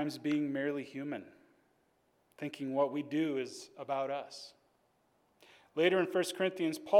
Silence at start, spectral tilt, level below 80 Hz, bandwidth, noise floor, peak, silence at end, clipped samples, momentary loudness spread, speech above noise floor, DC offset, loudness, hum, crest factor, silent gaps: 0 s; -5 dB/octave; -88 dBFS; 16 kHz; -74 dBFS; -14 dBFS; 0 s; under 0.1%; 14 LU; 40 dB; under 0.1%; -35 LUFS; none; 20 dB; none